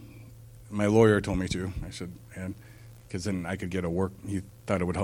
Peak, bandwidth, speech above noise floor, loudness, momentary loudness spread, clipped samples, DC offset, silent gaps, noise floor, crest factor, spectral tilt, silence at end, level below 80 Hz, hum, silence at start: -6 dBFS; 16.5 kHz; 20 dB; -29 LUFS; 22 LU; under 0.1%; under 0.1%; none; -48 dBFS; 22 dB; -6.5 dB/octave; 0 s; -48 dBFS; none; 0 s